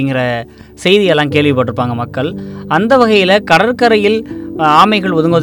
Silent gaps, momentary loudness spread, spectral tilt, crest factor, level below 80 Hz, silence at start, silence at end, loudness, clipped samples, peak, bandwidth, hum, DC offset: none; 10 LU; -6 dB/octave; 12 dB; -46 dBFS; 0 s; 0 s; -11 LUFS; 0.7%; 0 dBFS; 18 kHz; none; under 0.1%